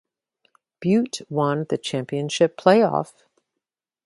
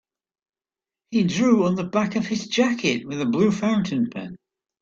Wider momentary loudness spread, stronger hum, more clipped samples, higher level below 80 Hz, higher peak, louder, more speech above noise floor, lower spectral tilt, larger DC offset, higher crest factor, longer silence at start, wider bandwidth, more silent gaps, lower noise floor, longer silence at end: about the same, 10 LU vs 8 LU; neither; neither; second, -68 dBFS vs -62 dBFS; first, 0 dBFS vs -6 dBFS; about the same, -22 LUFS vs -22 LUFS; second, 64 dB vs over 69 dB; about the same, -5.5 dB/octave vs -5.5 dB/octave; neither; about the same, 22 dB vs 18 dB; second, 0.8 s vs 1.1 s; first, 11.5 kHz vs 7.6 kHz; neither; second, -85 dBFS vs under -90 dBFS; first, 1 s vs 0.45 s